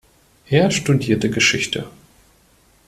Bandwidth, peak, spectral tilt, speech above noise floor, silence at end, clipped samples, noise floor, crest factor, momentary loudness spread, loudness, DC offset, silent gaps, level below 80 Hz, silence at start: 14 kHz; -2 dBFS; -4.5 dB/octave; 37 dB; 0.95 s; under 0.1%; -55 dBFS; 18 dB; 9 LU; -18 LUFS; under 0.1%; none; -50 dBFS; 0.5 s